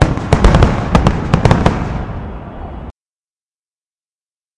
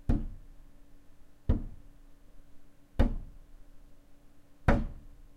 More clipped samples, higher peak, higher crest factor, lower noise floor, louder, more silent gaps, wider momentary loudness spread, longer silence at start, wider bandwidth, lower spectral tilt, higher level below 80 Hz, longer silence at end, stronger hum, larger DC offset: first, 0.2% vs under 0.1%; first, 0 dBFS vs -8 dBFS; second, 14 dB vs 26 dB; first, under -90 dBFS vs -54 dBFS; first, -13 LUFS vs -34 LUFS; neither; second, 18 LU vs 24 LU; about the same, 0 s vs 0.1 s; first, 11 kHz vs 6.6 kHz; second, -7 dB/octave vs -8.5 dB/octave; first, -20 dBFS vs -36 dBFS; first, 1.65 s vs 0.1 s; neither; neither